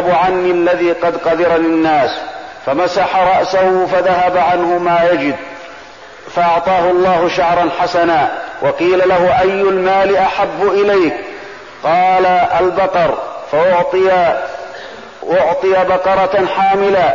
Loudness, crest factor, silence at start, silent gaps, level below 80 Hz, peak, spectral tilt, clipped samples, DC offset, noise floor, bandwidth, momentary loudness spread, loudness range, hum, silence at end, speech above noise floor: -13 LUFS; 8 dB; 0 s; none; -46 dBFS; -4 dBFS; -6 dB/octave; under 0.1%; 0.4%; -35 dBFS; 7.4 kHz; 12 LU; 2 LU; none; 0 s; 23 dB